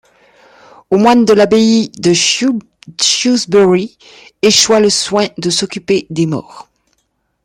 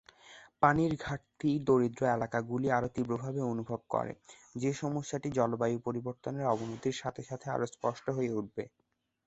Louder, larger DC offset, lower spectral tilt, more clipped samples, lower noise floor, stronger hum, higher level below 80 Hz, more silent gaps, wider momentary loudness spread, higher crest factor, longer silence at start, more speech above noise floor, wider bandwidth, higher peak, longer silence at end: first, -11 LUFS vs -33 LUFS; neither; second, -3.5 dB/octave vs -6.5 dB/octave; neither; first, -65 dBFS vs -57 dBFS; neither; first, -54 dBFS vs -62 dBFS; neither; second, 8 LU vs 11 LU; second, 12 dB vs 24 dB; first, 0.9 s vs 0.25 s; first, 53 dB vs 24 dB; first, 16 kHz vs 8.2 kHz; first, 0 dBFS vs -10 dBFS; first, 0.85 s vs 0.6 s